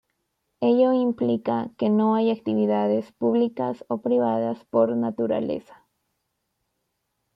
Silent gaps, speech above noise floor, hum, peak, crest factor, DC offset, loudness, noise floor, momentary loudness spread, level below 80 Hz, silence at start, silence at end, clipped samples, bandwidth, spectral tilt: none; 54 dB; none; -8 dBFS; 16 dB; under 0.1%; -23 LUFS; -77 dBFS; 7 LU; -70 dBFS; 0.6 s; 1.75 s; under 0.1%; 5.2 kHz; -9.5 dB/octave